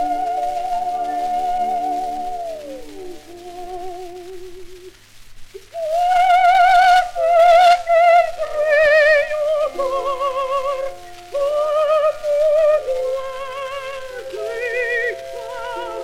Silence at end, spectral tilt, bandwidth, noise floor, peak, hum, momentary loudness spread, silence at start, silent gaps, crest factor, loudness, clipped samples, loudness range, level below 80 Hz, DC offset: 0 s; -2.5 dB/octave; 15 kHz; -41 dBFS; -2 dBFS; none; 22 LU; 0 s; none; 16 dB; -17 LUFS; under 0.1%; 15 LU; -46 dBFS; under 0.1%